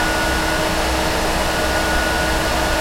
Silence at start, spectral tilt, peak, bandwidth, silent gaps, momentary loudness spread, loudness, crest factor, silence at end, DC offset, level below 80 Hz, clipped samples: 0 s; -3.5 dB/octave; -6 dBFS; 16.5 kHz; none; 1 LU; -18 LUFS; 12 dB; 0 s; under 0.1%; -26 dBFS; under 0.1%